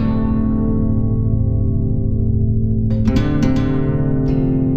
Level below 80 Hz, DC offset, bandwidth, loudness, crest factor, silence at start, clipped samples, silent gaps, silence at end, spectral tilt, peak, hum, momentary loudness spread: -22 dBFS; under 0.1%; 7 kHz; -18 LUFS; 12 dB; 0 s; under 0.1%; none; 0 s; -9.5 dB/octave; -4 dBFS; none; 2 LU